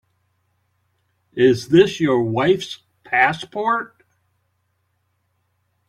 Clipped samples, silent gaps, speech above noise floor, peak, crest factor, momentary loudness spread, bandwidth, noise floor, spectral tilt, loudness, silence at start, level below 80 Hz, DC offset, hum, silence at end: under 0.1%; none; 52 dB; -2 dBFS; 20 dB; 18 LU; 11 kHz; -69 dBFS; -6 dB/octave; -18 LUFS; 1.35 s; -58 dBFS; under 0.1%; none; 2 s